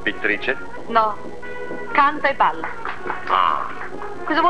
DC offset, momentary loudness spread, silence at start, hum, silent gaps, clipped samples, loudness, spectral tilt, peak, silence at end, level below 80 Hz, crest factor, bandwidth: 4%; 14 LU; 0 s; 60 Hz at -50 dBFS; none; under 0.1%; -21 LUFS; -5 dB/octave; -2 dBFS; 0 s; -50 dBFS; 20 dB; 11 kHz